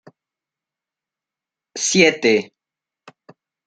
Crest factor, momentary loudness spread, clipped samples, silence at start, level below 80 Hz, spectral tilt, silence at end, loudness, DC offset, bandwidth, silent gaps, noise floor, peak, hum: 22 dB; 21 LU; under 0.1%; 1.75 s; -64 dBFS; -3 dB/octave; 1.2 s; -16 LUFS; under 0.1%; 9.4 kHz; none; -88 dBFS; -2 dBFS; none